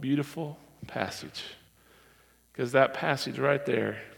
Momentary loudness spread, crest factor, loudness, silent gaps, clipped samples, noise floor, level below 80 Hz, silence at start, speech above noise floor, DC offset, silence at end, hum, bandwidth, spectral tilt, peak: 16 LU; 24 dB; -30 LUFS; none; under 0.1%; -61 dBFS; -68 dBFS; 0 s; 32 dB; under 0.1%; 0.05 s; none; 18 kHz; -5.5 dB/octave; -6 dBFS